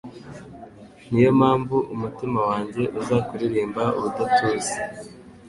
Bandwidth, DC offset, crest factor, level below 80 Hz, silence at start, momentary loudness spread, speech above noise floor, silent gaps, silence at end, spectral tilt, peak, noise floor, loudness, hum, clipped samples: 11.5 kHz; under 0.1%; 18 dB; -54 dBFS; 0.05 s; 22 LU; 22 dB; none; 0 s; -6 dB/octave; -4 dBFS; -44 dBFS; -22 LUFS; none; under 0.1%